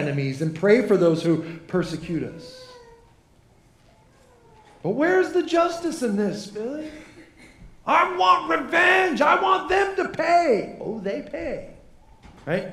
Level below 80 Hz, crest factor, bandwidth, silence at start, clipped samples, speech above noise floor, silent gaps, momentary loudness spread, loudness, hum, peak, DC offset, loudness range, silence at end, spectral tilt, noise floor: -54 dBFS; 18 dB; 13 kHz; 0 s; under 0.1%; 34 dB; none; 14 LU; -22 LUFS; none; -4 dBFS; under 0.1%; 10 LU; 0 s; -5.5 dB/octave; -56 dBFS